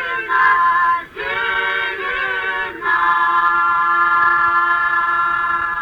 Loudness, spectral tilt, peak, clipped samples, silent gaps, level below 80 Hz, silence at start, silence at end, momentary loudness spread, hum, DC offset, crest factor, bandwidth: -16 LUFS; -3.5 dB/octave; -2 dBFS; under 0.1%; none; -50 dBFS; 0 s; 0 s; 7 LU; none; under 0.1%; 14 dB; 18 kHz